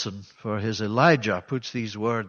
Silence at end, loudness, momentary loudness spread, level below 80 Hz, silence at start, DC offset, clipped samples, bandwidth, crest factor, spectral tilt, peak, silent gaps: 0 s; -25 LUFS; 13 LU; -64 dBFS; 0 s; under 0.1%; under 0.1%; 7 kHz; 20 dB; -6 dB/octave; -4 dBFS; none